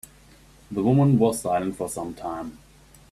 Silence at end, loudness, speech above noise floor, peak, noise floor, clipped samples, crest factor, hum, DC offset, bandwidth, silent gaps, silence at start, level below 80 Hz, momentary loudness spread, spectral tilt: 0.55 s; -24 LUFS; 29 dB; -8 dBFS; -52 dBFS; under 0.1%; 18 dB; none; under 0.1%; 14 kHz; none; 0.7 s; -52 dBFS; 15 LU; -7.5 dB/octave